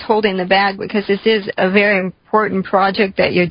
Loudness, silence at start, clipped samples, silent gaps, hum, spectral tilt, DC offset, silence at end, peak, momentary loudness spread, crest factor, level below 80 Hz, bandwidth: -15 LUFS; 0 s; under 0.1%; none; none; -11 dB/octave; under 0.1%; 0 s; 0 dBFS; 5 LU; 14 dB; -50 dBFS; 5.4 kHz